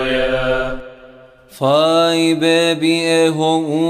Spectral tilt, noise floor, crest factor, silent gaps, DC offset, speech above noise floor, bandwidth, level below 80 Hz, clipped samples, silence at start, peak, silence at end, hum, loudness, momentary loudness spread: -4.5 dB/octave; -42 dBFS; 14 dB; none; under 0.1%; 28 dB; 15 kHz; -38 dBFS; under 0.1%; 0 s; -2 dBFS; 0 s; none; -15 LUFS; 8 LU